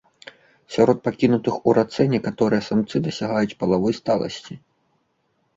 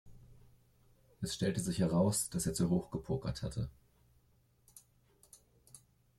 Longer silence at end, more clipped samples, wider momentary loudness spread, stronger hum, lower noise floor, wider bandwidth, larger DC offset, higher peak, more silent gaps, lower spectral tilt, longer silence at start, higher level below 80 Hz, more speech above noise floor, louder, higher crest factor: first, 1 s vs 0.4 s; neither; about the same, 10 LU vs 11 LU; neither; about the same, -69 dBFS vs -71 dBFS; second, 7.8 kHz vs 14 kHz; neither; first, -2 dBFS vs -18 dBFS; neither; first, -7 dB/octave vs -5.5 dB/octave; first, 0.7 s vs 0.05 s; about the same, -56 dBFS vs -58 dBFS; first, 48 dB vs 36 dB; first, -21 LUFS vs -35 LUFS; about the same, 20 dB vs 20 dB